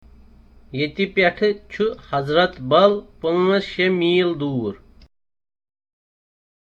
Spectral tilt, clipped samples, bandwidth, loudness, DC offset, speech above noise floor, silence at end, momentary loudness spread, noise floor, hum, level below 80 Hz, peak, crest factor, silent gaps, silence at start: -7 dB/octave; under 0.1%; 7.2 kHz; -20 LUFS; under 0.1%; 28 dB; 2.05 s; 10 LU; -48 dBFS; none; -52 dBFS; -2 dBFS; 20 dB; none; 0.7 s